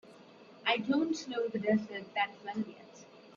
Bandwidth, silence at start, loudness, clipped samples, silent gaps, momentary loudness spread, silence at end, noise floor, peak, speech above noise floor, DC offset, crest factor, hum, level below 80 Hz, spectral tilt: 7.6 kHz; 0.05 s; -34 LUFS; under 0.1%; none; 17 LU; 0 s; -56 dBFS; -14 dBFS; 22 dB; under 0.1%; 20 dB; none; -80 dBFS; -5 dB/octave